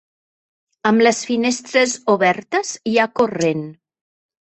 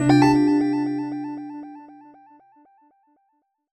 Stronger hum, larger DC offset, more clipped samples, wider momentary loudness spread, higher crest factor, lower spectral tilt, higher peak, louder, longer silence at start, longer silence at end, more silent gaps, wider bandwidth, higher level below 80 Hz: neither; neither; neither; second, 7 LU vs 23 LU; about the same, 18 dB vs 18 dB; second, -4 dB/octave vs -7 dB/octave; about the same, -2 dBFS vs -4 dBFS; about the same, -18 LUFS vs -20 LUFS; first, 0.85 s vs 0 s; second, 0.7 s vs 1.8 s; neither; about the same, 8.6 kHz vs 8.8 kHz; second, -64 dBFS vs -54 dBFS